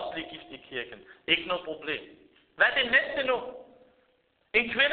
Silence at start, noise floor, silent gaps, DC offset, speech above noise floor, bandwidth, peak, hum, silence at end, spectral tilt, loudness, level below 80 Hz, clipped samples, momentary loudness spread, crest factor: 0 s; -70 dBFS; none; under 0.1%; 42 dB; 4.7 kHz; -8 dBFS; none; 0 s; 1 dB/octave; -27 LUFS; -64 dBFS; under 0.1%; 18 LU; 22 dB